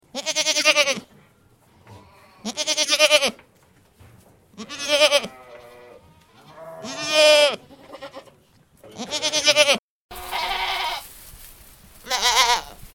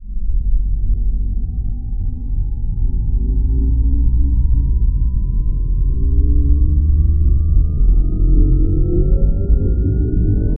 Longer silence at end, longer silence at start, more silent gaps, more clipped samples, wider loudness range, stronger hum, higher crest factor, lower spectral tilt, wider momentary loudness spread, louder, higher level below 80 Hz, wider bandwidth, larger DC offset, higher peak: about the same, 0.05 s vs 0.05 s; first, 0.15 s vs 0 s; first, 9.79-10.09 s vs none; neither; about the same, 4 LU vs 5 LU; neither; first, 24 dB vs 12 dB; second, 0 dB/octave vs -17 dB/octave; first, 24 LU vs 8 LU; about the same, -19 LUFS vs -18 LUFS; second, -54 dBFS vs -14 dBFS; first, 19 kHz vs 1.5 kHz; neither; about the same, 0 dBFS vs 0 dBFS